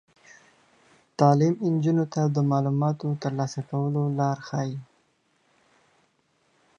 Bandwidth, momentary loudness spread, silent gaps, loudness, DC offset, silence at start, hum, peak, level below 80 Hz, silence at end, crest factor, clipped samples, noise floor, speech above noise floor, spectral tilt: 7.2 kHz; 9 LU; none; -25 LUFS; under 0.1%; 1.2 s; none; -4 dBFS; -72 dBFS; 1.95 s; 22 dB; under 0.1%; -68 dBFS; 44 dB; -8 dB/octave